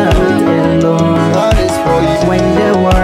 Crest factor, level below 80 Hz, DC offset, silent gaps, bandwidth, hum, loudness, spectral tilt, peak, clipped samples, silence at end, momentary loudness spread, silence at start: 10 dB; -20 dBFS; under 0.1%; none; 15.5 kHz; none; -11 LUFS; -6.5 dB/octave; 0 dBFS; under 0.1%; 0 s; 1 LU; 0 s